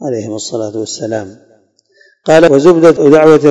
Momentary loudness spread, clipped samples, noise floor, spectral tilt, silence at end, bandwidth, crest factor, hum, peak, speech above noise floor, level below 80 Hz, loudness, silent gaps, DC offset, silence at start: 14 LU; 5%; -51 dBFS; -6 dB/octave; 0 s; 11.5 kHz; 10 dB; none; 0 dBFS; 42 dB; -48 dBFS; -9 LUFS; none; under 0.1%; 0 s